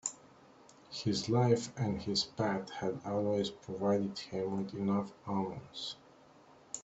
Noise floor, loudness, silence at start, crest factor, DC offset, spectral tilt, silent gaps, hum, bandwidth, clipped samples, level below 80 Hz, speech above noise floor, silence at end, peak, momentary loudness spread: -60 dBFS; -35 LUFS; 0.05 s; 20 dB; under 0.1%; -5.5 dB/octave; none; none; 8.2 kHz; under 0.1%; -68 dBFS; 26 dB; 0 s; -16 dBFS; 11 LU